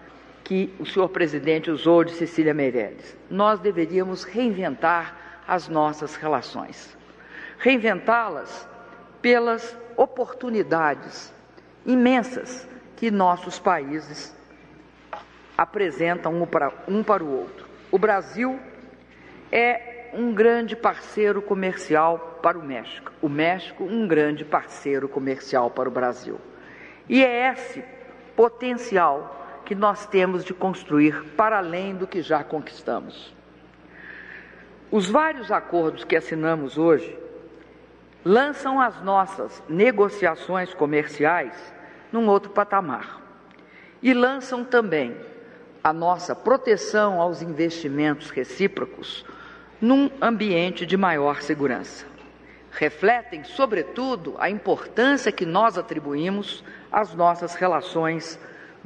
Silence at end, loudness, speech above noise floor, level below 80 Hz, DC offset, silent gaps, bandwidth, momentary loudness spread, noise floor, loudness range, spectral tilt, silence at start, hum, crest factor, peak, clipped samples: 0.15 s; -23 LUFS; 27 dB; -62 dBFS; under 0.1%; none; 9.6 kHz; 19 LU; -50 dBFS; 3 LU; -5.5 dB/octave; 0.05 s; none; 22 dB; -2 dBFS; under 0.1%